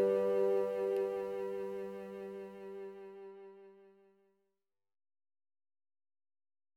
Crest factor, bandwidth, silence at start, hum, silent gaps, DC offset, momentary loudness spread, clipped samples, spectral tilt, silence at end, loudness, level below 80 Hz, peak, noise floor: 18 dB; 15 kHz; 0 s; none; none; under 0.1%; 21 LU; under 0.1%; -7 dB/octave; 2.9 s; -37 LUFS; -80 dBFS; -22 dBFS; -89 dBFS